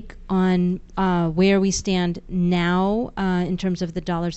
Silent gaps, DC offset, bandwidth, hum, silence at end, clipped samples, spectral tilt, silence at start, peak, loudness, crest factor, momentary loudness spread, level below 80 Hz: none; under 0.1%; 8.2 kHz; none; 0 s; under 0.1%; -6 dB/octave; 0 s; -8 dBFS; -22 LUFS; 14 dB; 7 LU; -40 dBFS